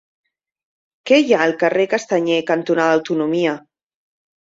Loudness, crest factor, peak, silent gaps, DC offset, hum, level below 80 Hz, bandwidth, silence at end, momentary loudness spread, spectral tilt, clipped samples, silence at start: -17 LUFS; 18 dB; -2 dBFS; none; under 0.1%; none; -66 dBFS; 7.8 kHz; 0.8 s; 6 LU; -5 dB/octave; under 0.1%; 1.05 s